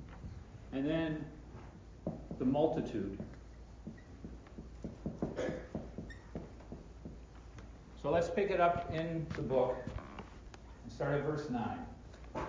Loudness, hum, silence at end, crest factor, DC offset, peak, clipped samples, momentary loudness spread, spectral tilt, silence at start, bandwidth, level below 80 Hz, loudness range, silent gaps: -37 LUFS; none; 0 s; 22 dB; under 0.1%; -16 dBFS; under 0.1%; 20 LU; -7.5 dB/octave; 0 s; 7.6 kHz; -54 dBFS; 9 LU; none